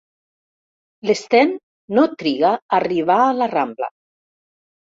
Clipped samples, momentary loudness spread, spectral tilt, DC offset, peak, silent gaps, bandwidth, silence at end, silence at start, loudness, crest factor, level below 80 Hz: under 0.1%; 11 LU; -5 dB/octave; under 0.1%; -2 dBFS; 1.63-1.88 s, 2.62-2.69 s; 7.8 kHz; 1.05 s; 1.05 s; -18 LUFS; 18 dB; -66 dBFS